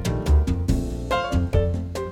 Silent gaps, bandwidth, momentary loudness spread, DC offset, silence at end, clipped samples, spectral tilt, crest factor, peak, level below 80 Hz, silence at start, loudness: none; 14 kHz; 5 LU; under 0.1%; 0 s; under 0.1%; -7 dB/octave; 14 dB; -8 dBFS; -26 dBFS; 0 s; -23 LUFS